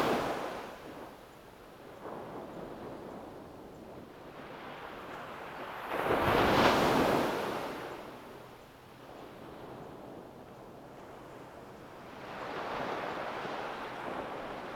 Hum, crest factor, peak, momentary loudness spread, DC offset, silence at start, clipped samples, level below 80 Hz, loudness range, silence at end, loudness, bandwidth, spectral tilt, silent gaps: none; 24 dB; -12 dBFS; 23 LU; under 0.1%; 0 s; under 0.1%; -58 dBFS; 18 LU; 0 s; -34 LUFS; over 20 kHz; -5 dB/octave; none